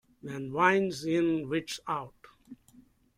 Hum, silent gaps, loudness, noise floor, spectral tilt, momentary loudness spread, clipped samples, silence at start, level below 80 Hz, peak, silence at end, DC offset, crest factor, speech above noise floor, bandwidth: none; none; -29 LUFS; -60 dBFS; -5.5 dB/octave; 15 LU; under 0.1%; 0.25 s; -66 dBFS; -10 dBFS; 0.65 s; under 0.1%; 22 dB; 31 dB; 15.5 kHz